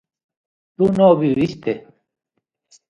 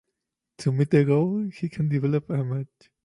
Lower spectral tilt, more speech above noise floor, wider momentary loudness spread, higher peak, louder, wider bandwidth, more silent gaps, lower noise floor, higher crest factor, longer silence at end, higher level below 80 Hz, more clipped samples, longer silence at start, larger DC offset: about the same, -8.5 dB/octave vs -8.5 dB/octave; second, 42 dB vs 59 dB; about the same, 13 LU vs 11 LU; first, -2 dBFS vs -8 dBFS; first, -17 LUFS vs -25 LUFS; second, 9.2 kHz vs 11 kHz; neither; second, -58 dBFS vs -83 dBFS; about the same, 18 dB vs 16 dB; first, 1.1 s vs 0.4 s; first, -54 dBFS vs -64 dBFS; neither; first, 0.8 s vs 0.6 s; neither